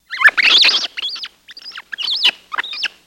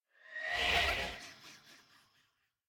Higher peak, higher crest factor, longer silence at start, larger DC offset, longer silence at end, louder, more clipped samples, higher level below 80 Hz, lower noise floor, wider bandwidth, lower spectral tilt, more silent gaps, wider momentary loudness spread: first, 0 dBFS vs -18 dBFS; about the same, 18 dB vs 22 dB; second, 0.1 s vs 0.25 s; neither; second, 0.2 s vs 0.95 s; first, -13 LUFS vs -33 LUFS; neither; second, -64 dBFS vs -54 dBFS; second, -37 dBFS vs -77 dBFS; about the same, 16.5 kHz vs 17.5 kHz; second, 2.5 dB/octave vs -2 dB/octave; neither; about the same, 23 LU vs 23 LU